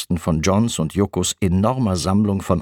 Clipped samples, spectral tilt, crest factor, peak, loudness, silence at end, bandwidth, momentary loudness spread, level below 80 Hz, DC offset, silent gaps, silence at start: under 0.1%; -5.5 dB/octave; 18 dB; -2 dBFS; -19 LUFS; 0 s; 17.5 kHz; 2 LU; -40 dBFS; under 0.1%; none; 0 s